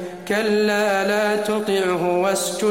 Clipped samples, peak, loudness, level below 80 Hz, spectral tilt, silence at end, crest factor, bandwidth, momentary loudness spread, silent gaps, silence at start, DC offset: under 0.1%; -8 dBFS; -20 LUFS; -62 dBFS; -4 dB/octave; 0 s; 12 dB; 16.5 kHz; 3 LU; none; 0 s; 0.2%